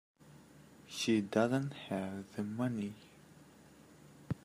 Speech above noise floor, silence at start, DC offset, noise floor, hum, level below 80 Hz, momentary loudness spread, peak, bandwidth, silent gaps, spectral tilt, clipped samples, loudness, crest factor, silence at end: 24 dB; 0.25 s; under 0.1%; -60 dBFS; none; -72 dBFS; 14 LU; -16 dBFS; 15.5 kHz; none; -5.5 dB/octave; under 0.1%; -37 LUFS; 22 dB; 0.05 s